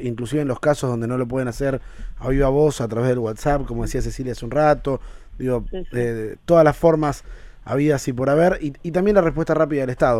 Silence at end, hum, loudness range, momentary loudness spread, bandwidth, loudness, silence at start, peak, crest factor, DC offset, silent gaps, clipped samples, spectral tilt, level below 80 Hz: 0 s; none; 4 LU; 11 LU; 15.5 kHz; -21 LUFS; 0 s; -2 dBFS; 18 dB; under 0.1%; none; under 0.1%; -7 dB/octave; -34 dBFS